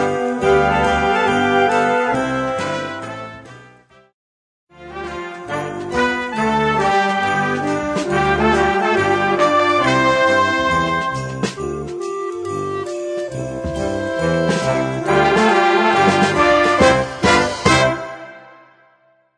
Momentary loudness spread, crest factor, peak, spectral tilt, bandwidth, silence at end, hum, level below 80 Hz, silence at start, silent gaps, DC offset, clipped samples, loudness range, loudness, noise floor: 12 LU; 16 dB; 0 dBFS; -5 dB/octave; 10.5 kHz; 0.95 s; none; -40 dBFS; 0 s; 4.14-4.67 s; under 0.1%; under 0.1%; 9 LU; -17 LUFS; -56 dBFS